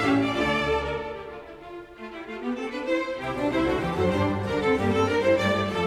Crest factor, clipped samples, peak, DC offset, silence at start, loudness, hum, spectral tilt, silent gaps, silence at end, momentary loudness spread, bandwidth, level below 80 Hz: 16 dB; under 0.1%; -10 dBFS; under 0.1%; 0 s; -25 LUFS; none; -6 dB/octave; none; 0 s; 17 LU; 14.5 kHz; -46 dBFS